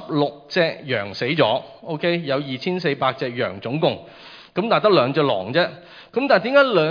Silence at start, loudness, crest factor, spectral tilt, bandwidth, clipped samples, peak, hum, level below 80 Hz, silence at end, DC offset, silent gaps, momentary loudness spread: 0 s; -20 LUFS; 18 dB; -7 dB/octave; 5.2 kHz; under 0.1%; -2 dBFS; none; -66 dBFS; 0 s; under 0.1%; none; 10 LU